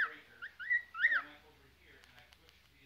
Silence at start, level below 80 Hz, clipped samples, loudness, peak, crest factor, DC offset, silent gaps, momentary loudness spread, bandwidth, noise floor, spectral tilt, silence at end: 0 s; -74 dBFS; under 0.1%; -34 LUFS; -20 dBFS; 20 dB; under 0.1%; none; 19 LU; 16 kHz; -65 dBFS; -2 dB/octave; 1.5 s